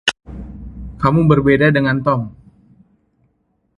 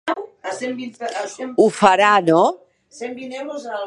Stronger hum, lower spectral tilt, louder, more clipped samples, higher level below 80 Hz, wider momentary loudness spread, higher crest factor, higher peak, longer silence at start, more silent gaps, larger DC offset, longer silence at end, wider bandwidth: neither; first, -6.5 dB/octave vs -4.5 dB/octave; first, -15 LUFS vs -18 LUFS; neither; first, -38 dBFS vs -68 dBFS; first, 21 LU vs 17 LU; about the same, 18 dB vs 20 dB; about the same, 0 dBFS vs 0 dBFS; about the same, 0.05 s vs 0.05 s; neither; neither; first, 1.45 s vs 0 s; about the same, 11.5 kHz vs 11.5 kHz